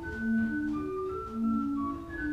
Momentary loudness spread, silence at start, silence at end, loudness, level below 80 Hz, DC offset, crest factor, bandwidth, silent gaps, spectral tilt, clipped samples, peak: 6 LU; 0 s; 0 s; -32 LUFS; -50 dBFS; under 0.1%; 12 dB; 7.6 kHz; none; -8 dB/octave; under 0.1%; -20 dBFS